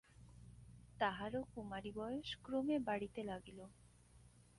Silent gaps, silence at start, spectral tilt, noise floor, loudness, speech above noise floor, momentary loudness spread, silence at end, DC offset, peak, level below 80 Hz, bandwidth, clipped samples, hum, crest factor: none; 0.2 s; -6 dB/octave; -66 dBFS; -44 LUFS; 23 dB; 22 LU; 0.2 s; under 0.1%; -22 dBFS; -66 dBFS; 11.5 kHz; under 0.1%; 60 Hz at -60 dBFS; 22 dB